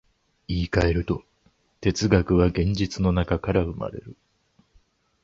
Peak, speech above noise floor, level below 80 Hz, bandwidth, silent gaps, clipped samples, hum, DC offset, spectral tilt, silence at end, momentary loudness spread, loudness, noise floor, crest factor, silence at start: -4 dBFS; 42 dB; -36 dBFS; 7.8 kHz; none; under 0.1%; none; under 0.1%; -6.5 dB/octave; 1.1 s; 11 LU; -24 LUFS; -64 dBFS; 20 dB; 0.5 s